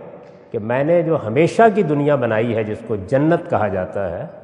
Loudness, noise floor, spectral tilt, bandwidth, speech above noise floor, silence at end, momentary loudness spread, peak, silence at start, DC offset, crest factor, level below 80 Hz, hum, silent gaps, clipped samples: -18 LUFS; -39 dBFS; -8 dB/octave; 10.5 kHz; 21 dB; 0.05 s; 11 LU; 0 dBFS; 0 s; under 0.1%; 18 dB; -58 dBFS; none; none; under 0.1%